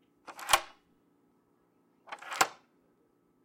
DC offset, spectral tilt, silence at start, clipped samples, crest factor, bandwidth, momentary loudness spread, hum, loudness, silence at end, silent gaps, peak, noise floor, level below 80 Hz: under 0.1%; 0.5 dB/octave; 0.3 s; under 0.1%; 30 dB; 16.5 kHz; 22 LU; none; -30 LUFS; 0.9 s; none; -8 dBFS; -70 dBFS; -68 dBFS